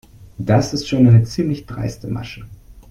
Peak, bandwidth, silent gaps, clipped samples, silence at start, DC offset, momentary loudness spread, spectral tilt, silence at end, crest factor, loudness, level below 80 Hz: -2 dBFS; 10 kHz; none; under 0.1%; 0.2 s; under 0.1%; 16 LU; -7 dB/octave; 0.1 s; 16 dB; -18 LUFS; -42 dBFS